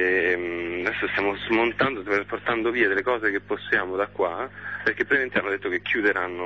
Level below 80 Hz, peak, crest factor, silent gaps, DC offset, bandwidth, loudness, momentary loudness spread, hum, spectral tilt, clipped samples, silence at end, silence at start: -56 dBFS; -8 dBFS; 16 dB; none; 0.1%; 7.6 kHz; -24 LUFS; 5 LU; 50 Hz at -50 dBFS; -6 dB/octave; under 0.1%; 0 s; 0 s